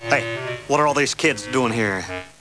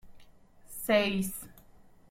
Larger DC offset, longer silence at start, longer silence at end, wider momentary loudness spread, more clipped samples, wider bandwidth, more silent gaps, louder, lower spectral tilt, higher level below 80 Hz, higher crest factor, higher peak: neither; about the same, 0 s vs 0.05 s; second, 0.1 s vs 0.55 s; second, 9 LU vs 20 LU; neither; second, 11 kHz vs 16.5 kHz; neither; first, -21 LUFS vs -30 LUFS; about the same, -4 dB/octave vs -4 dB/octave; about the same, -54 dBFS vs -58 dBFS; about the same, 18 dB vs 20 dB; first, -2 dBFS vs -12 dBFS